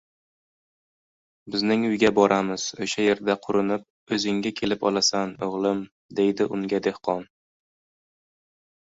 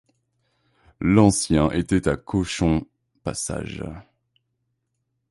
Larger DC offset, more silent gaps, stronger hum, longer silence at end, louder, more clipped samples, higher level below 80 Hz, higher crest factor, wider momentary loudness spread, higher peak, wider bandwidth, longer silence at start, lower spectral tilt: neither; first, 3.90-4.07 s, 5.91-6.09 s vs none; neither; first, 1.6 s vs 1.3 s; about the same, -24 LUFS vs -22 LUFS; neither; second, -62 dBFS vs -40 dBFS; about the same, 22 dB vs 20 dB; second, 9 LU vs 17 LU; about the same, -4 dBFS vs -4 dBFS; second, 8 kHz vs 11.5 kHz; first, 1.45 s vs 1 s; second, -4 dB/octave vs -5.5 dB/octave